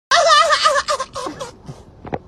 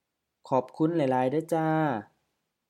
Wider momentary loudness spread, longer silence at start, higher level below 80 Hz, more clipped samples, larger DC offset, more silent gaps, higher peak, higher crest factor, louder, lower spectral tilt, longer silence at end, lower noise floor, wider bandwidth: first, 20 LU vs 4 LU; second, 0.1 s vs 0.45 s; first, -48 dBFS vs -80 dBFS; neither; neither; neither; first, -2 dBFS vs -12 dBFS; about the same, 16 dB vs 16 dB; first, -14 LUFS vs -28 LUFS; second, -1 dB/octave vs -8 dB/octave; second, 0.1 s vs 0.65 s; second, -38 dBFS vs -79 dBFS; about the same, 13 kHz vs 13.5 kHz